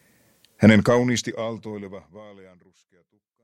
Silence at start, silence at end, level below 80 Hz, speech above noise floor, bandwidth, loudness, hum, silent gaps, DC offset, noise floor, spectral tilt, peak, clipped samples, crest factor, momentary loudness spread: 0.6 s; 1.2 s; -56 dBFS; 37 dB; 12.5 kHz; -20 LUFS; none; none; under 0.1%; -60 dBFS; -6 dB/octave; -2 dBFS; under 0.1%; 22 dB; 22 LU